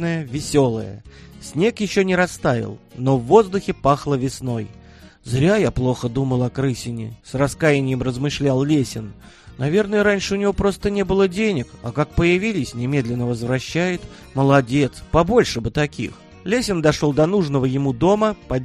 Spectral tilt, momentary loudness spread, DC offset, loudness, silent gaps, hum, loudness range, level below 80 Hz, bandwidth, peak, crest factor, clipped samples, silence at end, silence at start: -6 dB/octave; 11 LU; under 0.1%; -20 LUFS; none; none; 2 LU; -40 dBFS; 13 kHz; 0 dBFS; 20 dB; under 0.1%; 0 s; 0 s